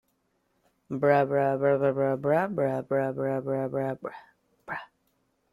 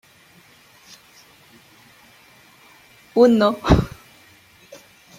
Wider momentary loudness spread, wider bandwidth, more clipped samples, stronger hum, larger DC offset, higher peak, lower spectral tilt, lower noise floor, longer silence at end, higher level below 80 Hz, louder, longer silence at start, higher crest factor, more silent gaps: first, 15 LU vs 11 LU; second, 12.5 kHz vs 16 kHz; neither; neither; neither; second, -8 dBFS vs -2 dBFS; first, -9 dB/octave vs -7 dB/octave; first, -73 dBFS vs -52 dBFS; second, 0.65 s vs 1.3 s; second, -70 dBFS vs -36 dBFS; second, -27 LUFS vs -18 LUFS; second, 0.9 s vs 3.15 s; about the same, 20 dB vs 22 dB; neither